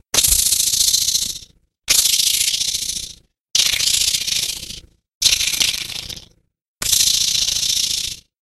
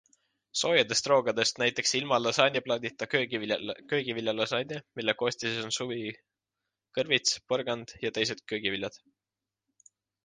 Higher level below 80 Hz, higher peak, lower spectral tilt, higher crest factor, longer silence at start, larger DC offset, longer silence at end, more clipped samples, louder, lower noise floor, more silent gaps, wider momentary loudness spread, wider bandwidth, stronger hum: first, -42 dBFS vs -72 dBFS; first, 0 dBFS vs -6 dBFS; second, 2 dB/octave vs -2.5 dB/octave; about the same, 20 dB vs 24 dB; second, 0.15 s vs 0.55 s; neither; second, 0.2 s vs 1.3 s; neither; first, -15 LUFS vs -29 LUFS; second, -51 dBFS vs under -90 dBFS; first, 3.41-3.45 s, 5.08-5.21 s, 6.68-6.76 s vs none; first, 15 LU vs 10 LU; first, 16 kHz vs 10 kHz; neither